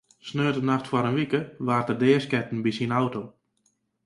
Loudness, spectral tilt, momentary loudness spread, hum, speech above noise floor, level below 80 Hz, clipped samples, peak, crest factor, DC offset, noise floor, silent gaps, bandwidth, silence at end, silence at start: -25 LUFS; -7 dB/octave; 7 LU; none; 46 dB; -64 dBFS; under 0.1%; -8 dBFS; 18 dB; under 0.1%; -71 dBFS; none; 11.5 kHz; 0.75 s; 0.25 s